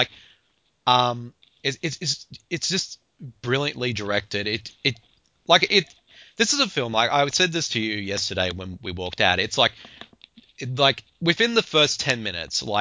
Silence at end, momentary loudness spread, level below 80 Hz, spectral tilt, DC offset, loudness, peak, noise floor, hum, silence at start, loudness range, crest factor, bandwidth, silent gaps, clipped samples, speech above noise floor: 0 s; 14 LU; -52 dBFS; -3 dB/octave; under 0.1%; -22 LUFS; -2 dBFS; -68 dBFS; none; 0 s; 5 LU; 22 dB; 7.8 kHz; none; under 0.1%; 44 dB